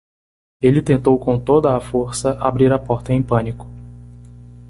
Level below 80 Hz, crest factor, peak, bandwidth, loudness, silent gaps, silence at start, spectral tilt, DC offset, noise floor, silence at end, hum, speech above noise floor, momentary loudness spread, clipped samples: -40 dBFS; 16 dB; -2 dBFS; 11.5 kHz; -17 LUFS; none; 0.6 s; -7.5 dB/octave; under 0.1%; -39 dBFS; 0.4 s; 60 Hz at -30 dBFS; 23 dB; 10 LU; under 0.1%